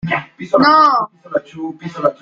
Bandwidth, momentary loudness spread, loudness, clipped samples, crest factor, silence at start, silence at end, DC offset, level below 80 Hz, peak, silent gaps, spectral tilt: 7.4 kHz; 17 LU; -14 LUFS; under 0.1%; 14 dB; 0.05 s; 0.1 s; under 0.1%; -56 dBFS; -2 dBFS; none; -6.5 dB/octave